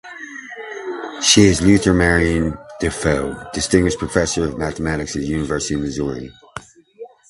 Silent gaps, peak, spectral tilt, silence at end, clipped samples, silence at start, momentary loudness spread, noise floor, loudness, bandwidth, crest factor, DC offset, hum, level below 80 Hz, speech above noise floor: none; 0 dBFS; -4 dB/octave; 0.25 s; under 0.1%; 0.05 s; 19 LU; -40 dBFS; -18 LUFS; 11.5 kHz; 18 dB; under 0.1%; none; -34 dBFS; 23 dB